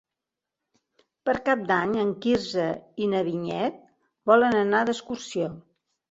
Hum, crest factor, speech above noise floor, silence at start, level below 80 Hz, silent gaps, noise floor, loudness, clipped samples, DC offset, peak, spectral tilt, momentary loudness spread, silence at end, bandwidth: none; 22 dB; 63 dB; 1.25 s; -62 dBFS; none; -87 dBFS; -25 LUFS; under 0.1%; under 0.1%; -4 dBFS; -5.5 dB/octave; 11 LU; 0.5 s; 8 kHz